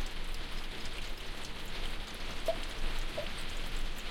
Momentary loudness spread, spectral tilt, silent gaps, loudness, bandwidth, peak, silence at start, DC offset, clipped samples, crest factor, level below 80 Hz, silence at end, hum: 5 LU; -3.5 dB/octave; none; -41 LUFS; 16 kHz; -20 dBFS; 0 s; under 0.1%; under 0.1%; 16 dB; -38 dBFS; 0 s; none